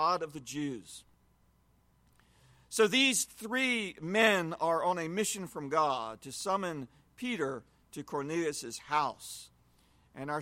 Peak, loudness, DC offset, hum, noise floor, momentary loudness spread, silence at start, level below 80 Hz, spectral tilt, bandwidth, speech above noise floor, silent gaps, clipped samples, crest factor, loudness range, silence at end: -12 dBFS; -32 LUFS; under 0.1%; none; -68 dBFS; 19 LU; 0 s; -70 dBFS; -3 dB/octave; 16.5 kHz; 35 dB; none; under 0.1%; 22 dB; 7 LU; 0 s